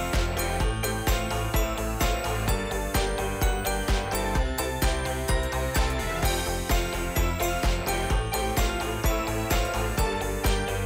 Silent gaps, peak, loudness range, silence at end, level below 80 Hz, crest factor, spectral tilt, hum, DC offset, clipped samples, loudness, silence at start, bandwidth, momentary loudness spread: none; -16 dBFS; 1 LU; 0 s; -30 dBFS; 10 dB; -4 dB/octave; none; under 0.1%; under 0.1%; -27 LUFS; 0 s; 16.5 kHz; 1 LU